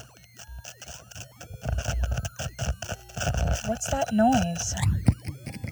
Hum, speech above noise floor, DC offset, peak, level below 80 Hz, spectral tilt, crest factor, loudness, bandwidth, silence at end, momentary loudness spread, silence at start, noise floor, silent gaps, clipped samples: none; 24 dB; under 0.1%; -6 dBFS; -34 dBFS; -5 dB/octave; 22 dB; -28 LUFS; over 20 kHz; 0 s; 19 LU; 0 s; -48 dBFS; none; under 0.1%